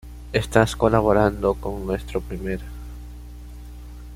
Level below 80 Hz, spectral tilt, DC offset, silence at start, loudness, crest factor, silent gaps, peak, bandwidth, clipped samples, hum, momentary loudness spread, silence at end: -36 dBFS; -6.5 dB/octave; under 0.1%; 0.05 s; -22 LUFS; 22 dB; none; -2 dBFS; 16.5 kHz; under 0.1%; 60 Hz at -35 dBFS; 22 LU; 0 s